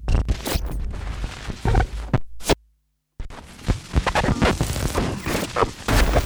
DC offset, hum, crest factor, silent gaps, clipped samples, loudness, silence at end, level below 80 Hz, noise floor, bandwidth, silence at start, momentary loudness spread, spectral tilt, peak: under 0.1%; none; 20 dB; none; under 0.1%; -24 LUFS; 0 s; -26 dBFS; -68 dBFS; over 20 kHz; 0 s; 11 LU; -5 dB/octave; -4 dBFS